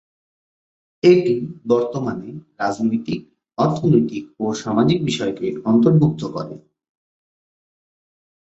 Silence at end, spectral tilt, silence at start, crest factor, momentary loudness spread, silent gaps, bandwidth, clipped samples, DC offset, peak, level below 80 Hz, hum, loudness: 1.9 s; -7.5 dB/octave; 1.05 s; 18 dB; 14 LU; none; 8 kHz; under 0.1%; under 0.1%; -2 dBFS; -56 dBFS; none; -19 LUFS